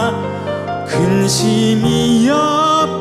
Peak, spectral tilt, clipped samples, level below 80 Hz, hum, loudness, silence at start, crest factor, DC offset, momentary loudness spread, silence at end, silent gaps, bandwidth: -4 dBFS; -5 dB/octave; under 0.1%; -44 dBFS; none; -14 LUFS; 0 s; 10 dB; under 0.1%; 9 LU; 0 s; none; 15 kHz